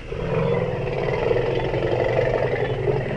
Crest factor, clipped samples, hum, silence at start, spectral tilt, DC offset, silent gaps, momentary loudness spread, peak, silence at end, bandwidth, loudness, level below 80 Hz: 14 dB; under 0.1%; none; 0 s; -8 dB/octave; under 0.1%; none; 3 LU; -8 dBFS; 0 s; 9.6 kHz; -23 LUFS; -36 dBFS